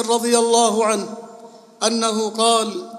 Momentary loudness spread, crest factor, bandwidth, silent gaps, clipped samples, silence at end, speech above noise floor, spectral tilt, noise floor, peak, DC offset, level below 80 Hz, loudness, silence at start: 8 LU; 16 dB; 14.5 kHz; none; under 0.1%; 0 s; 24 dB; -2.5 dB/octave; -42 dBFS; -2 dBFS; under 0.1%; -78 dBFS; -18 LUFS; 0 s